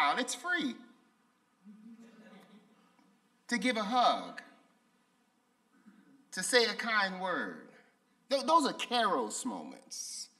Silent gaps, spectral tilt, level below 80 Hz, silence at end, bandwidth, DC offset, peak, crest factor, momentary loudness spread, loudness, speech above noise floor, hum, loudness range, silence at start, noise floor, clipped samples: none; -2 dB/octave; -88 dBFS; 0.15 s; 15 kHz; under 0.1%; -12 dBFS; 24 dB; 16 LU; -32 LUFS; 41 dB; none; 9 LU; 0 s; -73 dBFS; under 0.1%